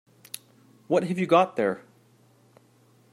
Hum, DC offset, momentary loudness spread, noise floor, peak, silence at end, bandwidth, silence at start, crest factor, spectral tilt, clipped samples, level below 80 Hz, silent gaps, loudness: none; under 0.1%; 20 LU; -60 dBFS; -8 dBFS; 1.35 s; 16 kHz; 0.9 s; 20 dB; -6 dB/octave; under 0.1%; -76 dBFS; none; -24 LUFS